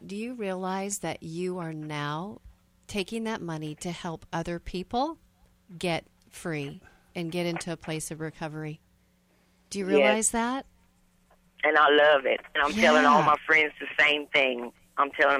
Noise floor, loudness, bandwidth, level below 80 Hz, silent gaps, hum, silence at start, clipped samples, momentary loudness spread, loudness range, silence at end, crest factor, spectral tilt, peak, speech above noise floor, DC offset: -65 dBFS; -26 LUFS; 16 kHz; -56 dBFS; none; none; 0 s; under 0.1%; 16 LU; 13 LU; 0 s; 20 dB; -3.5 dB/octave; -8 dBFS; 39 dB; under 0.1%